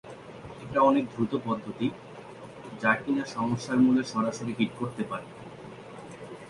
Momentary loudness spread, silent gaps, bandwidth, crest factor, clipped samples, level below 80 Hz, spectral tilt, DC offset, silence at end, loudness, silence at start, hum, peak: 21 LU; none; 11 kHz; 22 dB; under 0.1%; -62 dBFS; -6 dB/octave; under 0.1%; 0 s; -28 LUFS; 0.05 s; none; -8 dBFS